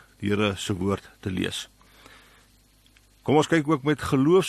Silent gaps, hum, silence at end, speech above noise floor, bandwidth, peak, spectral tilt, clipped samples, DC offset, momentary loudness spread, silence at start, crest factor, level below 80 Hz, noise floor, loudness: none; none; 0 s; 35 dB; 13 kHz; -6 dBFS; -5.5 dB/octave; under 0.1%; under 0.1%; 12 LU; 0.2 s; 18 dB; -54 dBFS; -59 dBFS; -25 LUFS